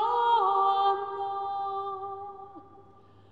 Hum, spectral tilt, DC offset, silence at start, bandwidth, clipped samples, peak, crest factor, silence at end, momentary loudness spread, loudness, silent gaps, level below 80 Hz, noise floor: none; -5 dB/octave; 0.1%; 0 s; 7.4 kHz; under 0.1%; -14 dBFS; 16 dB; 0.5 s; 19 LU; -27 LUFS; none; -74 dBFS; -56 dBFS